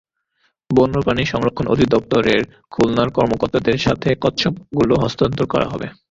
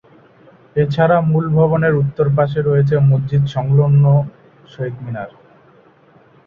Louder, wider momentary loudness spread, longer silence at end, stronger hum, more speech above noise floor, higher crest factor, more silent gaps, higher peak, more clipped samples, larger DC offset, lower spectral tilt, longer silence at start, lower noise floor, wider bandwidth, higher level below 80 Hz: second, -18 LUFS vs -15 LUFS; second, 4 LU vs 14 LU; second, 0.2 s vs 1.2 s; neither; first, 48 dB vs 35 dB; about the same, 16 dB vs 14 dB; neither; about the same, -2 dBFS vs -2 dBFS; neither; neither; second, -6.5 dB/octave vs -10 dB/octave; about the same, 0.7 s vs 0.75 s; first, -66 dBFS vs -49 dBFS; first, 7.8 kHz vs 4.8 kHz; first, -40 dBFS vs -48 dBFS